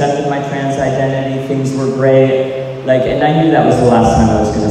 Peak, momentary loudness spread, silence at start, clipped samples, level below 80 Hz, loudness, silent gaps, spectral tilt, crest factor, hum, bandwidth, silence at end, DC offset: 0 dBFS; 7 LU; 0 s; under 0.1%; -32 dBFS; -13 LUFS; none; -7 dB/octave; 12 dB; none; 11 kHz; 0 s; under 0.1%